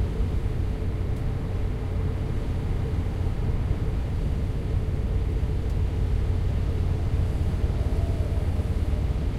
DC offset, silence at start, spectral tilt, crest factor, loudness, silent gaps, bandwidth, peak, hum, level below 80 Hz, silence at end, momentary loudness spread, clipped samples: under 0.1%; 0 s; -8 dB/octave; 14 dB; -28 LUFS; none; 12 kHz; -12 dBFS; none; -28 dBFS; 0 s; 3 LU; under 0.1%